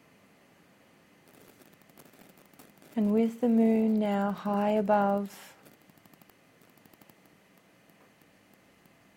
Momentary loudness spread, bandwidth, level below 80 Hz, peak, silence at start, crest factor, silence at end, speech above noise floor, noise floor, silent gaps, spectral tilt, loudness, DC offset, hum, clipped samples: 14 LU; 16.5 kHz; -74 dBFS; -14 dBFS; 2.95 s; 18 dB; 3.7 s; 35 dB; -61 dBFS; none; -8 dB/octave; -27 LUFS; under 0.1%; none; under 0.1%